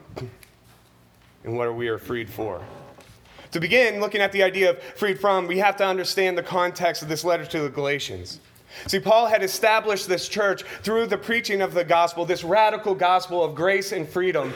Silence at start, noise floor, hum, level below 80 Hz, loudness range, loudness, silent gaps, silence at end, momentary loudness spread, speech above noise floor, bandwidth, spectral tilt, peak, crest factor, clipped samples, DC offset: 0.1 s; -55 dBFS; none; -60 dBFS; 4 LU; -22 LUFS; none; 0 s; 12 LU; 33 dB; over 20 kHz; -4 dB/octave; -4 dBFS; 20 dB; under 0.1%; under 0.1%